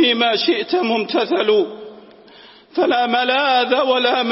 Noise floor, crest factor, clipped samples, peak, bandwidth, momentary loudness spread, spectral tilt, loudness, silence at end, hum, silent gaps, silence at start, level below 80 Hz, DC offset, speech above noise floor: -45 dBFS; 14 dB; under 0.1%; -4 dBFS; 5.8 kHz; 5 LU; -7 dB/octave; -17 LUFS; 0 s; none; none; 0 s; -68 dBFS; under 0.1%; 28 dB